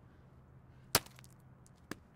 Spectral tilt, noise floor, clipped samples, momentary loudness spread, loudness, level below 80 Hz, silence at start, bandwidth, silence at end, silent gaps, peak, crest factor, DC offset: -2 dB/octave; -60 dBFS; under 0.1%; 26 LU; -34 LUFS; -66 dBFS; 0.95 s; 17 kHz; 1.15 s; none; -8 dBFS; 36 dB; under 0.1%